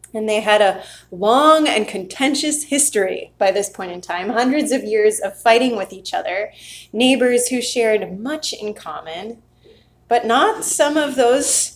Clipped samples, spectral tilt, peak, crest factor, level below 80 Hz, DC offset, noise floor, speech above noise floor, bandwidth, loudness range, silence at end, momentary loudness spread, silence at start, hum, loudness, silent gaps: under 0.1%; -2 dB/octave; 0 dBFS; 18 dB; -58 dBFS; under 0.1%; -50 dBFS; 33 dB; 16 kHz; 4 LU; 0 s; 15 LU; 0.15 s; none; -17 LUFS; none